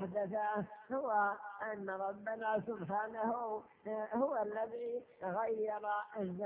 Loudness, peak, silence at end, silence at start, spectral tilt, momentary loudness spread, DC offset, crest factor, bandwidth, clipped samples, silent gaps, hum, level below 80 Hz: -39 LUFS; -22 dBFS; 0 s; 0 s; -6 dB/octave; 7 LU; under 0.1%; 16 dB; 3.8 kHz; under 0.1%; none; none; -78 dBFS